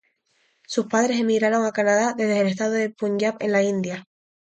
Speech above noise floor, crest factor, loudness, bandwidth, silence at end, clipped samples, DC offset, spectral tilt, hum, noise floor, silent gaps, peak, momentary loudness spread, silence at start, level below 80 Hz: 45 dB; 16 dB; -22 LUFS; 9.2 kHz; 0.4 s; under 0.1%; under 0.1%; -5 dB/octave; none; -67 dBFS; none; -8 dBFS; 7 LU; 0.7 s; -70 dBFS